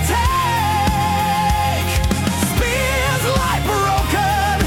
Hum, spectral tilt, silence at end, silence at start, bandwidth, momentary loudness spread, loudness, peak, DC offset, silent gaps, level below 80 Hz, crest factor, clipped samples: none; -4.5 dB/octave; 0 s; 0 s; 18 kHz; 1 LU; -17 LUFS; -4 dBFS; under 0.1%; none; -26 dBFS; 12 dB; under 0.1%